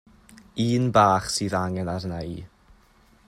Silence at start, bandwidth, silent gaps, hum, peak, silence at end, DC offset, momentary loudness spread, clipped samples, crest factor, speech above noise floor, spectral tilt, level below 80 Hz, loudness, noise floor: 0.3 s; 15.5 kHz; none; none; -4 dBFS; 0.8 s; under 0.1%; 17 LU; under 0.1%; 22 dB; 34 dB; -5.5 dB/octave; -52 dBFS; -23 LUFS; -57 dBFS